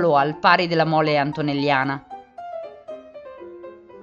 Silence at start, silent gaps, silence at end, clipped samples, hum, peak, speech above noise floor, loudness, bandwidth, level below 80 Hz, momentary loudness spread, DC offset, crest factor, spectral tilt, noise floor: 0 s; none; 0 s; under 0.1%; none; -2 dBFS; 21 dB; -20 LUFS; 7.4 kHz; -60 dBFS; 22 LU; under 0.1%; 20 dB; -7 dB/octave; -41 dBFS